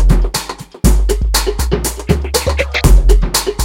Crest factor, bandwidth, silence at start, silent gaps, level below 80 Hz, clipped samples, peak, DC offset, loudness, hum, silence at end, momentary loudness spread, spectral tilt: 12 dB; 17 kHz; 0 s; none; -14 dBFS; 0.2%; 0 dBFS; under 0.1%; -14 LUFS; none; 0 s; 6 LU; -4.5 dB/octave